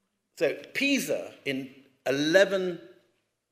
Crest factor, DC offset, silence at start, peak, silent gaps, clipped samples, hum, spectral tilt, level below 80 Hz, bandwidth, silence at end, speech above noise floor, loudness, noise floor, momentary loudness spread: 22 dB; under 0.1%; 0.35 s; -6 dBFS; none; under 0.1%; none; -3.5 dB/octave; -82 dBFS; 15.5 kHz; 0.65 s; 45 dB; -27 LUFS; -72 dBFS; 14 LU